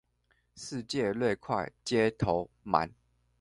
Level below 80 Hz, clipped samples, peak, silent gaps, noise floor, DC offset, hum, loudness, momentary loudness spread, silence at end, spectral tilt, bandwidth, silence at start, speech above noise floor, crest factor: -58 dBFS; under 0.1%; -8 dBFS; none; -73 dBFS; under 0.1%; none; -31 LUFS; 11 LU; 0.5 s; -5.5 dB/octave; 11.5 kHz; 0.55 s; 42 dB; 24 dB